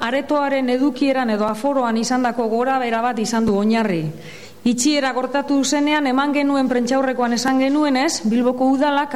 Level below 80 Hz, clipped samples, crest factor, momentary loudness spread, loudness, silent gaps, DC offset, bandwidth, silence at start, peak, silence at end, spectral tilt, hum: -56 dBFS; under 0.1%; 12 dB; 3 LU; -18 LUFS; none; 0.8%; 14.5 kHz; 0 s; -6 dBFS; 0 s; -4 dB/octave; none